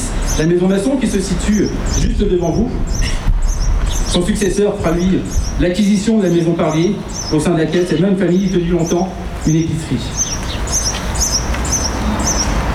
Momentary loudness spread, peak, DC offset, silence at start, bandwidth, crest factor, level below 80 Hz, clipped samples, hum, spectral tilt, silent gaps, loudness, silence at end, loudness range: 6 LU; -4 dBFS; under 0.1%; 0 s; 15 kHz; 12 dB; -20 dBFS; under 0.1%; none; -5 dB/octave; none; -16 LUFS; 0 s; 2 LU